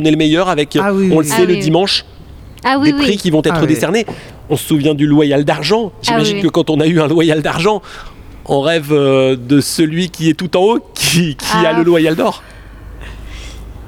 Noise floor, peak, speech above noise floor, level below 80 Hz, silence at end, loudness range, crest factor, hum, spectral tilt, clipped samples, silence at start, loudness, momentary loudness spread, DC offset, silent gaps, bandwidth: -34 dBFS; 0 dBFS; 22 dB; -38 dBFS; 0 s; 2 LU; 12 dB; none; -5 dB/octave; under 0.1%; 0 s; -13 LUFS; 11 LU; under 0.1%; none; 17.5 kHz